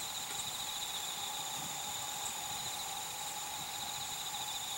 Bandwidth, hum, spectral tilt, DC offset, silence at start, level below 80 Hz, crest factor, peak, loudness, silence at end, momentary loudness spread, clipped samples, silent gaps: 17 kHz; none; 0.5 dB/octave; under 0.1%; 0 s; -70 dBFS; 14 dB; -26 dBFS; -38 LUFS; 0 s; 2 LU; under 0.1%; none